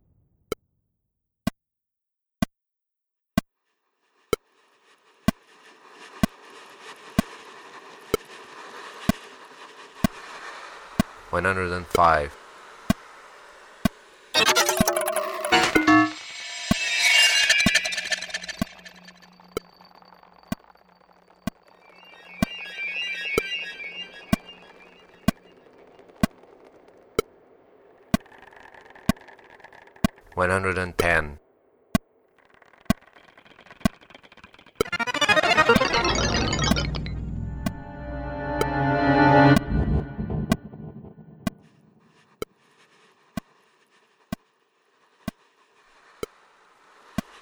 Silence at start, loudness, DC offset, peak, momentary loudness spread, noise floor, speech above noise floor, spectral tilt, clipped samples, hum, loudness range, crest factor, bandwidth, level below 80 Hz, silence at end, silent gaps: 1.45 s; -24 LUFS; under 0.1%; -4 dBFS; 23 LU; -85 dBFS; 63 dB; -4 dB/octave; under 0.1%; none; 19 LU; 22 dB; over 20 kHz; -42 dBFS; 0.2 s; none